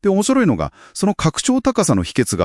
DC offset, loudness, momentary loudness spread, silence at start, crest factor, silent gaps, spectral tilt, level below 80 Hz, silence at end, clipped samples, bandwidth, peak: under 0.1%; -17 LUFS; 6 LU; 0.05 s; 16 dB; none; -5 dB/octave; -42 dBFS; 0 s; under 0.1%; 12 kHz; -2 dBFS